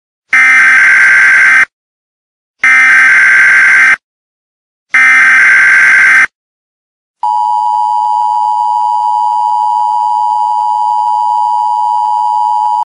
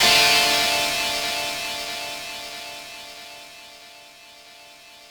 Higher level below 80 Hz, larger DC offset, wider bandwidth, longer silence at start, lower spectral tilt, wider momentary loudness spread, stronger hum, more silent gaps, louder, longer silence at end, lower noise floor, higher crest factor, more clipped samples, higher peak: about the same, -58 dBFS vs -56 dBFS; neither; second, 14.5 kHz vs over 20 kHz; first, 0.3 s vs 0 s; about the same, 0.5 dB/octave vs 0 dB/octave; second, 8 LU vs 25 LU; neither; first, 1.73-2.54 s, 4.04-4.86 s, 6.35-7.14 s vs none; first, -6 LUFS vs -20 LUFS; about the same, 0 s vs 0.05 s; first, under -90 dBFS vs -46 dBFS; second, 8 dB vs 20 dB; first, 0.2% vs under 0.1%; first, 0 dBFS vs -6 dBFS